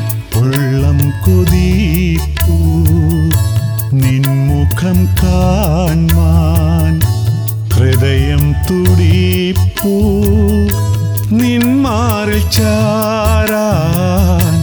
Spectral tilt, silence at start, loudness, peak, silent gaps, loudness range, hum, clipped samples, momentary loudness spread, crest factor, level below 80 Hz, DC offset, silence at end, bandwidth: -6.5 dB/octave; 0 s; -12 LUFS; 0 dBFS; none; 1 LU; none; under 0.1%; 3 LU; 10 dB; -20 dBFS; under 0.1%; 0 s; over 20 kHz